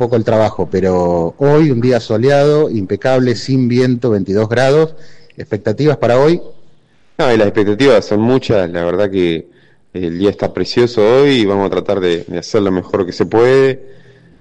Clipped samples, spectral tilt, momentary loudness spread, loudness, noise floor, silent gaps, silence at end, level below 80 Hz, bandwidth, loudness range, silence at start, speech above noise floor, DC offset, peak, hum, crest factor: under 0.1%; -7 dB/octave; 8 LU; -13 LUFS; -45 dBFS; none; 0.45 s; -46 dBFS; 10 kHz; 2 LU; 0 s; 32 dB; under 0.1%; -2 dBFS; none; 12 dB